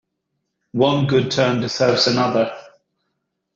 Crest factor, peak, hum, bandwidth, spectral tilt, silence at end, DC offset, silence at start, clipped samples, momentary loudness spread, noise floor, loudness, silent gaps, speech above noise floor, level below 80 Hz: 18 dB; -2 dBFS; none; 7.8 kHz; -5.5 dB/octave; 0.9 s; under 0.1%; 0.75 s; under 0.1%; 9 LU; -75 dBFS; -18 LUFS; none; 58 dB; -58 dBFS